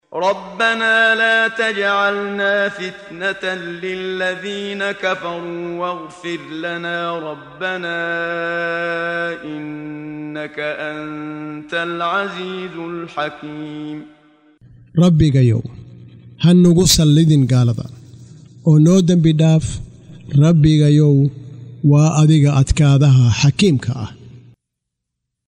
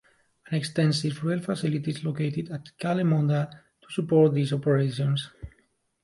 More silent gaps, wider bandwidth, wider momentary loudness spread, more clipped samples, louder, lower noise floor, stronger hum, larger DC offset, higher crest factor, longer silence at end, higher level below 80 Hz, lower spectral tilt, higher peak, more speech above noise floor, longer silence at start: neither; first, 16 kHz vs 11.5 kHz; first, 16 LU vs 12 LU; neither; first, -16 LUFS vs -26 LUFS; first, -78 dBFS vs -68 dBFS; neither; neither; about the same, 14 dB vs 18 dB; first, 1.1 s vs 0.55 s; first, -38 dBFS vs -58 dBFS; about the same, -6 dB/octave vs -7 dB/octave; first, -2 dBFS vs -8 dBFS; first, 62 dB vs 43 dB; second, 0.1 s vs 0.5 s